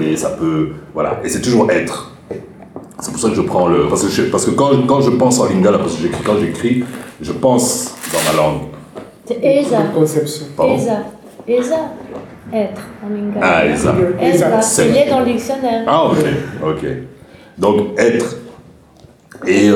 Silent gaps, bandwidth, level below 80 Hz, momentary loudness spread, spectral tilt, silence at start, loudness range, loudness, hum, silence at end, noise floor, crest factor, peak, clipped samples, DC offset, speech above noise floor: none; 19.5 kHz; -44 dBFS; 16 LU; -5 dB/octave; 0 s; 5 LU; -15 LUFS; none; 0 s; -44 dBFS; 14 dB; 0 dBFS; under 0.1%; under 0.1%; 30 dB